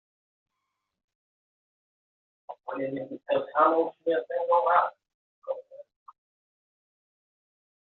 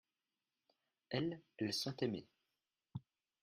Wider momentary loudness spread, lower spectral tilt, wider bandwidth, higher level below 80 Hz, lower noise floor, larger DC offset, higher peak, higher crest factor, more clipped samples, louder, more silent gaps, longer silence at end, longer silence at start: about the same, 15 LU vs 14 LU; second, -3 dB/octave vs -5 dB/octave; second, 4.2 kHz vs 13.5 kHz; about the same, -82 dBFS vs -78 dBFS; second, -83 dBFS vs under -90 dBFS; neither; first, -8 dBFS vs -24 dBFS; about the same, 22 dB vs 22 dB; neither; first, -27 LUFS vs -42 LUFS; first, 5.14-5.42 s vs none; first, 2.1 s vs 0.4 s; first, 2.5 s vs 1.1 s